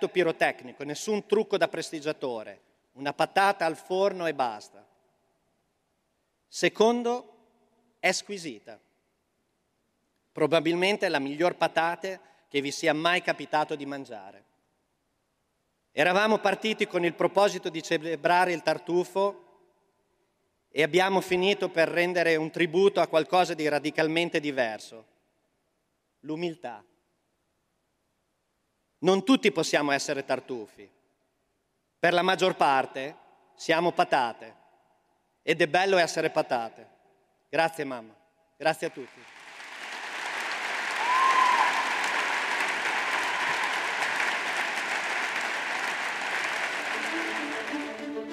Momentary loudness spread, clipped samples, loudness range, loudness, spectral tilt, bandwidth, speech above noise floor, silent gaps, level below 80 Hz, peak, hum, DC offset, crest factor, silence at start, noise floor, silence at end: 14 LU; under 0.1%; 7 LU; -27 LUFS; -3.5 dB/octave; 15.5 kHz; 49 dB; none; -78 dBFS; -8 dBFS; none; under 0.1%; 20 dB; 0 s; -76 dBFS; 0 s